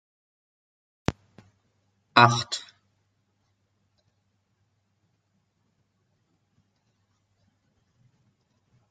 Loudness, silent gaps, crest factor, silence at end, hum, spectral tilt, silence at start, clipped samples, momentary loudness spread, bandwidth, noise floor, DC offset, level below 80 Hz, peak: -23 LUFS; none; 32 dB; 6.3 s; none; -4 dB/octave; 1.1 s; under 0.1%; 15 LU; 9.2 kHz; -73 dBFS; under 0.1%; -60 dBFS; 0 dBFS